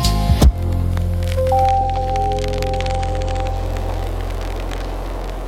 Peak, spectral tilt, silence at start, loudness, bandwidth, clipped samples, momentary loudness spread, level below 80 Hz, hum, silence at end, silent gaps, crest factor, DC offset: -2 dBFS; -6 dB/octave; 0 s; -20 LUFS; 16 kHz; under 0.1%; 11 LU; -22 dBFS; none; 0 s; none; 16 dB; under 0.1%